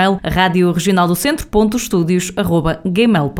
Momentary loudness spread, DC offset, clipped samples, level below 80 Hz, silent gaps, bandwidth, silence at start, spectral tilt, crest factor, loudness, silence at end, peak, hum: 3 LU; under 0.1%; under 0.1%; -34 dBFS; none; 18 kHz; 0 s; -5.5 dB/octave; 14 dB; -15 LUFS; 0 s; 0 dBFS; none